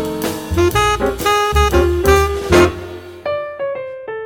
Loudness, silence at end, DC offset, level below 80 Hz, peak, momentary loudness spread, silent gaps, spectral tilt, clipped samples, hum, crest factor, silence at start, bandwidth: -15 LUFS; 0 s; under 0.1%; -24 dBFS; 0 dBFS; 14 LU; none; -5 dB/octave; under 0.1%; none; 14 dB; 0 s; 17.5 kHz